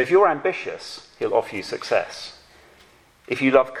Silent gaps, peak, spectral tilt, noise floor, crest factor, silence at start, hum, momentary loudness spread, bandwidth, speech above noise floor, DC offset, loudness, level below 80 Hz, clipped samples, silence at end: none; -2 dBFS; -5 dB/octave; -54 dBFS; 22 dB; 0 s; none; 18 LU; 12.5 kHz; 32 dB; under 0.1%; -22 LUFS; -62 dBFS; under 0.1%; 0 s